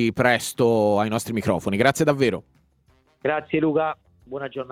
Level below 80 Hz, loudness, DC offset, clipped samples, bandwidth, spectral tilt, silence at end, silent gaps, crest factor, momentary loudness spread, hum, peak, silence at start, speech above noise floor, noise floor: -56 dBFS; -22 LUFS; under 0.1%; under 0.1%; 16.5 kHz; -5.5 dB/octave; 0 s; none; 20 dB; 13 LU; none; -2 dBFS; 0 s; 40 dB; -61 dBFS